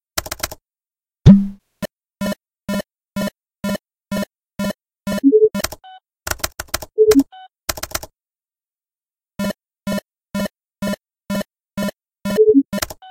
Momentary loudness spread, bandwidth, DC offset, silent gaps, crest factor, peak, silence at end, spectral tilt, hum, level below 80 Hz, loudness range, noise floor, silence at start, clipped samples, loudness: 17 LU; 17 kHz; under 0.1%; none; 20 dB; 0 dBFS; 0 s; -6 dB/octave; none; -38 dBFS; 9 LU; under -90 dBFS; 0.15 s; under 0.1%; -20 LUFS